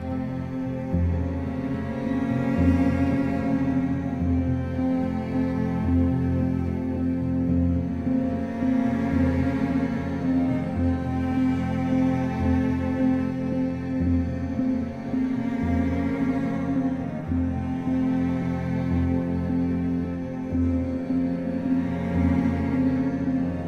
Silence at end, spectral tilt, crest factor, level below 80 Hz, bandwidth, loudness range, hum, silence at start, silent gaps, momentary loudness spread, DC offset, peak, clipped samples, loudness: 0 s; -9.5 dB/octave; 16 dB; -38 dBFS; 6.6 kHz; 2 LU; none; 0 s; none; 4 LU; 0.2%; -8 dBFS; under 0.1%; -25 LUFS